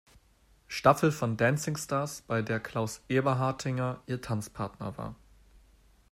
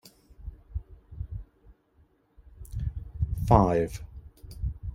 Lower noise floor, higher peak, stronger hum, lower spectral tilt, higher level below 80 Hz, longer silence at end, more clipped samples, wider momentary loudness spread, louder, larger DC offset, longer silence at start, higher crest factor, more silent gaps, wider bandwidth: about the same, -64 dBFS vs -64 dBFS; about the same, -6 dBFS vs -4 dBFS; neither; second, -5.5 dB/octave vs -8.5 dB/octave; second, -60 dBFS vs -38 dBFS; first, 0.95 s vs 0 s; neither; second, 13 LU vs 26 LU; about the same, -30 LUFS vs -28 LUFS; neither; first, 0.7 s vs 0.05 s; about the same, 24 dB vs 26 dB; neither; about the same, 16 kHz vs 16 kHz